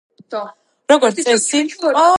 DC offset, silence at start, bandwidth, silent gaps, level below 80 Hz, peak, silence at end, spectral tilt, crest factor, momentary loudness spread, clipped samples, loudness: under 0.1%; 0.3 s; 11.5 kHz; none; -66 dBFS; 0 dBFS; 0 s; -2 dB/octave; 16 dB; 16 LU; under 0.1%; -15 LUFS